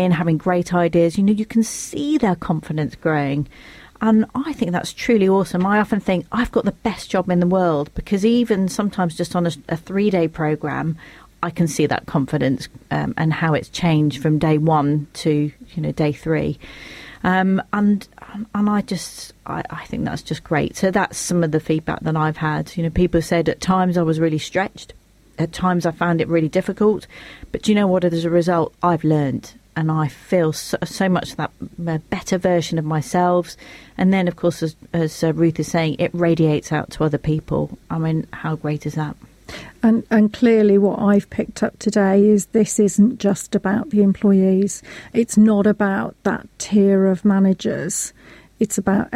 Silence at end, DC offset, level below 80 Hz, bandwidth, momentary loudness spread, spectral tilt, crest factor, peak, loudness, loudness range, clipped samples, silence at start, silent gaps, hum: 0 s; under 0.1%; -44 dBFS; 14.5 kHz; 11 LU; -6.5 dB/octave; 14 dB; -4 dBFS; -19 LUFS; 5 LU; under 0.1%; 0 s; none; none